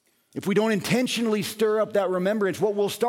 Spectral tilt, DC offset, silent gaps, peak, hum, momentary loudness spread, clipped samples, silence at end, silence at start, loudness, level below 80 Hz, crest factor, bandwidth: -5 dB/octave; under 0.1%; none; -10 dBFS; none; 3 LU; under 0.1%; 0 s; 0.35 s; -24 LUFS; -66 dBFS; 14 dB; 17 kHz